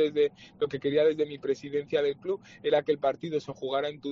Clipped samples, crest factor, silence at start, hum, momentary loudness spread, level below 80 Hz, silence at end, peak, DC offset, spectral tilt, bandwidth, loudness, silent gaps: under 0.1%; 16 dB; 0 s; none; 8 LU; -68 dBFS; 0 s; -12 dBFS; under 0.1%; -4 dB/octave; 7.2 kHz; -29 LUFS; none